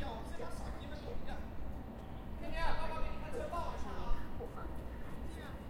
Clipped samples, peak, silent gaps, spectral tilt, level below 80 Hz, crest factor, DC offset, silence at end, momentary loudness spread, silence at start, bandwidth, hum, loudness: under 0.1%; -20 dBFS; none; -6 dB/octave; -44 dBFS; 18 dB; under 0.1%; 0 s; 7 LU; 0 s; 11.5 kHz; none; -45 LUFS